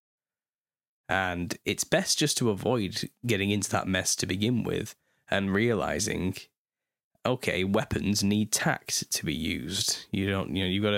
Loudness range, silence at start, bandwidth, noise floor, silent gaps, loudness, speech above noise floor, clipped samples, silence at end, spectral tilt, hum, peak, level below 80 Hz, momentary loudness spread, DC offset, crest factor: 3 LU; 1.1 s; 16.5 kHz; under -90 dBFS; 6.58-6.65 s, 7.04-7.11 s; -28 LUFS; over 62 dB; under 0.1%; 0 s; -3.5 dB/octave; none; -8 dBFS; -54 dBFS; 6 LU; under 0.1%; 20 dB